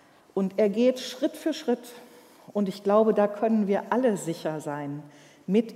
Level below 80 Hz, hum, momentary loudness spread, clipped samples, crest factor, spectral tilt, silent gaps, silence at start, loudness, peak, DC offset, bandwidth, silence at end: -82 dBFS; none; 12 LU; under 0.1%; 18 dB; -6 dB/octave; none; 0.35 s; -26 LUFS; -8 dBFS; under 0.1%; 15.5 kHz; 0 s